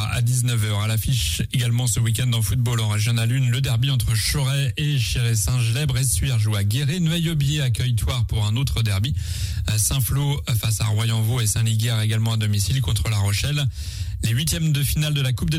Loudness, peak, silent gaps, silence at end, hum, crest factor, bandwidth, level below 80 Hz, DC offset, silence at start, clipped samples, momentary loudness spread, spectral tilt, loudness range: -21 LUFS; -8 dBFS; none; 0 s; none; 12 dB; 16 kHz; -34 dBFS; under 0.1%; 0 s; under 0.1%; 2 LU; -4.5 dB/octave; 1 LU